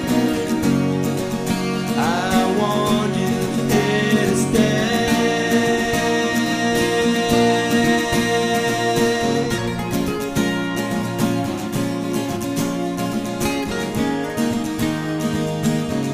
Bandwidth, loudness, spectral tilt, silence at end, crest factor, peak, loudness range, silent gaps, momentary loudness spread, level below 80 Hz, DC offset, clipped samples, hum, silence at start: 15.5 kHz; -19 LUFS; -5 dB/octave; 0 s; 16 dB; -4 dBFS; 5 LU; none; 6 LU; -44 dBFS; under 0.1%; under 0.1%; none; 0 s